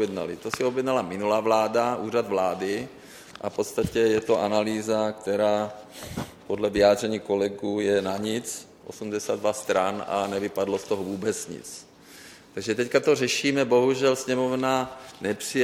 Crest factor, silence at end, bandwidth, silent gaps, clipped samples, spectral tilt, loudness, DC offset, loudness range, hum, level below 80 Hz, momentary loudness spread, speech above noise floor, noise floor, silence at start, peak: 20 dB; 0 s; 17 kHz; none; under 0.1%; -4.5 dB/octave; -25 LUFS; under 0.1%; 4 LU; none; -56 dBFS; 14 LU; 23 dB; -48 dBFS; 0 s; -6 dBFS